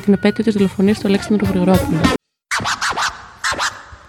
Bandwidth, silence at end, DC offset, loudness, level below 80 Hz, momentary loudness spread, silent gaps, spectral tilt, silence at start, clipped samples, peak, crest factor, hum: 17.5 kHz; 0.15 s; under 0.1%; -17 LUFS; -38 dBFS; 7 LU; none; -5 dB/octave; 0 s; under 0.1%; 0 dBFS; 16 dB; none